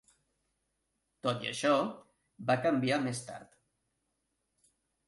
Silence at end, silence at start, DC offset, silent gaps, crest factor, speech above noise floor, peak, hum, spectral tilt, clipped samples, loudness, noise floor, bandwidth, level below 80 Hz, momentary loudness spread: 1.65 s; 1.25 s; under 0.1%; none; 20 dB; 50 dB; -16 dBFS; none; -5 dB/octave; under 0.1%; -32 LUFS; -82 dBFS; 11.5 kHz; -74 dBFS; 12 LU